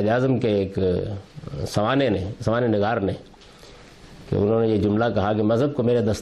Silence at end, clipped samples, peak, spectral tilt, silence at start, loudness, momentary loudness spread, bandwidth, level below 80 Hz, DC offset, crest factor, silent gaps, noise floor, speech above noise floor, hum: 0 s; under 0.1%; -10 dBFS; -7.5 dB/octave; 0 s; -22 LUFS; 8 LU; 12.5 kHz; -48 dBFS; under 0.1%; 12 dB; none; -46 dBFS; 24 dB; none